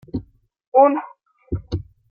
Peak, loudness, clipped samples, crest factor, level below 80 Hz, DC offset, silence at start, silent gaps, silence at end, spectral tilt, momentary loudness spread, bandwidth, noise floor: -2 dBFS; -20 LUFS; under 0.1%; 20 dB; -42 dBFS; under 0.1%; 0.15 s; 0.67-0.72 s; 0.3 s; -9.5 dB/octave; 17 LU; 6.6 kHz; -44 dBFS